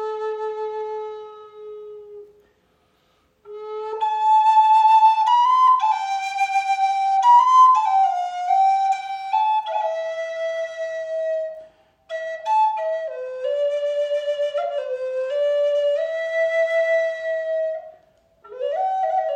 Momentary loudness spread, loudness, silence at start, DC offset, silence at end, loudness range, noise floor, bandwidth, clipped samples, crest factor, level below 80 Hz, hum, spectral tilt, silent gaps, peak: 17 LU; -20 LUFS; 0 s; under 0.1%; 0 s; 9 LU; -63 dBFS; 10 kHz; under 0.1%; 14 dB; -74 dBFS; none; 0 dB/octave; none; -6 dBFS